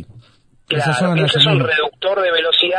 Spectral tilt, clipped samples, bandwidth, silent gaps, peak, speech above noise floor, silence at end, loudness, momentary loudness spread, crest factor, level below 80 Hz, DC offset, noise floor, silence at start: -5 dB/octave; under 0.1%; 10.5 kHz; none; 0 dBFS; 36 dB; 0 s; -15 LUFS; 7 LU; 16 dB; -56 dBFS; under 0.1%; -52 dBFS; 0 s